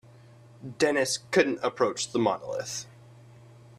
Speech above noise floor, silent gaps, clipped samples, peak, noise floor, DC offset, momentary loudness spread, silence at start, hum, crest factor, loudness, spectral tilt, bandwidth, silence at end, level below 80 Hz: 25 dB; none; under 0.1%; -8 dBFS; -52 dBFS; under 0.1%; 17 LU; 0.6 s; none; 22 dB; -27 LUFS; -3.5 dB/octave; 14.5 kHz; 0.9 s; -68 dBFS